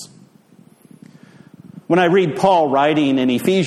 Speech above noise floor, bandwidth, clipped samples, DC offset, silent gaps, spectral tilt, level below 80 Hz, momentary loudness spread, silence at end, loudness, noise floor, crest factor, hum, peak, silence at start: 34 dB; 15 kHz; under 0.1%; under 0.1%; none; -6 dB/octave; -62 dBFS; 3 LU; 0 s; -16 LUFS; -49 dBFS; 16 dB; none; -2 dBFS; 0 s